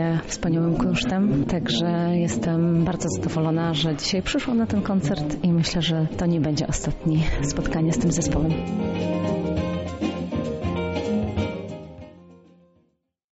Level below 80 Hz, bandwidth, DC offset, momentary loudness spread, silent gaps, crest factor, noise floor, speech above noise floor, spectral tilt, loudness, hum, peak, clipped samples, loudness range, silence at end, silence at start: -38 dBFS; 8 kHz; under 0.1%; 6 LU; none; 12 dB; -70 dBFS; 47 dB; -6 dB/octave; -24 LUFS; none; -12 dBFS; under 0.1%; 5 LU; 1 s; 0 s